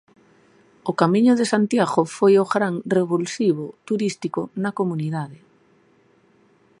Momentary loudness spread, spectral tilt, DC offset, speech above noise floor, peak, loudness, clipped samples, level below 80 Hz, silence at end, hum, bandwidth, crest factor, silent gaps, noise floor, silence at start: 11 LU; -6 dB/octave; under 0.1%; 38 dB; -2 dBFS; -21 LUFS; under 0.1%; -70 dBFS; 1.45 s; none; 11.5 kHz; 20 dB; none; -58 dBFS; 0.85 s